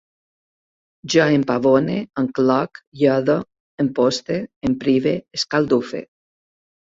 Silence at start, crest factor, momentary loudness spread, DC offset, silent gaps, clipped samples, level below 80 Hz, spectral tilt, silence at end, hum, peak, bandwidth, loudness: 1.05 s; 18 dB; 9 LU; under 0.1%; 2.87-2.92 s, 3.60-3.78 s, 4.56-4.61 s; under 0.1%; -56 dBFS; -5.5 dB/octave; 0.9 s; none; -2 dBFS; 7.8 kHz; -19 LUFS